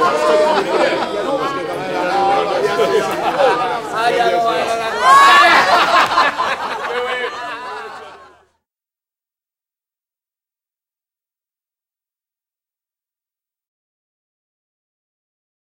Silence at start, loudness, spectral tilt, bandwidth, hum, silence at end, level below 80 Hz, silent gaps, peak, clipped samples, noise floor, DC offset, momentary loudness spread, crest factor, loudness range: 0 s; -14 LUFS; -2.5 dB/octave; 16 kHz; none; 7.6 s; -56 dBFS; none; 0 dBFS; under 0.1%; under -90 dBFS; under 0.1%; 14 LU; 18 dB; 14 LU